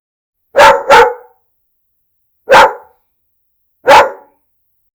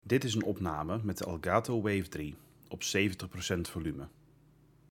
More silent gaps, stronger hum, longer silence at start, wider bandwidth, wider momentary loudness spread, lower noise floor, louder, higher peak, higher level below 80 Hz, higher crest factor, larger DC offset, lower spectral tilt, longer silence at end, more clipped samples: neither; neither; first, 0.55 s vs 0.05 s; first, over 20 kHz vs 18 kHz; second, 10 LU vs 14 LU; about the same, -63 dBFS vs -63 dBFS; first, -7 LUFS vs -34 LUFS; first, 0 dBFS vs -12 dBFS; first, -42 dBFS vs -58 dBFS; second, 12 dB vs 22 dB; neither; second, -2 dB/octave vs -5 dB/octave; about the same, 0.85 s vs 0.8 s; first, 2% vs under 0.1%